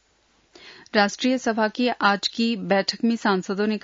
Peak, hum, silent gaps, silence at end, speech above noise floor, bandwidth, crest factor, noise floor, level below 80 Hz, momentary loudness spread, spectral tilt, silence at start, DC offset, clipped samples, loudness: -4 dBFS; none; none; 0.05 s; 41 dB; 7.8 kHz; 18 dB; -63 dBFS; -70 dBFS; 3 LU; -4.5 dB/octave; 0.65 s; under 0.1%; under 0.1%; -22 LUFS